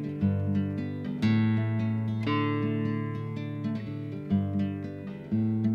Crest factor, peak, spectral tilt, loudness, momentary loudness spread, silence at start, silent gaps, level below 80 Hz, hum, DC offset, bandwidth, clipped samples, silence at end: 14 dB; -14 dBFS; -9 dB/octave; -30 LUFS; 8 LU; 0 s; none; -62 dBFS; none; under 0.1%; 6.2 kHz; under 0.1%; 0 s